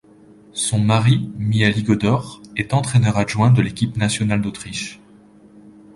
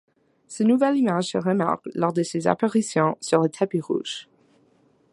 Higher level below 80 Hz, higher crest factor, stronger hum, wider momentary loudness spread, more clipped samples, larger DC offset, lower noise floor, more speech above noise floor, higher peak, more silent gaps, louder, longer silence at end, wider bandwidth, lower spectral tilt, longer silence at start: first, -46 dBFS vs -68 dBFS; about the same, 18 dB vs 20 dB; neither; first, 12 LU vs 8 LU; neither; neither; second, -47 dBFS vs -61 dBFS; second, 29 dB vs 39 dB; about the same, 0 dBFS vs -2 dBFS; neither; first, -19 LUFS vs -23 LUFS; second, 0.25 s vs 0.9 s; about the same, 11.5 kHz vs 11.5 kHz; about the same, -5.5 dB/octave vs -5.5 dB/octave; about the same, 0.55 s vs 0.5 s